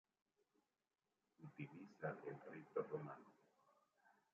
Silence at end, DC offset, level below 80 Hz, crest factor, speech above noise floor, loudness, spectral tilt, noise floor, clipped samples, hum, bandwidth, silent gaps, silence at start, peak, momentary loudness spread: 0.2 s; under 0.1%; under -90 dBFS; 22 dB; over 39 dB; -52 LUFS; -7.5 dB/octave; under -90 dBFS; under 0.1%; none; 7.2 kHz; none; 1.4 s; -32 dBFS; 14 LU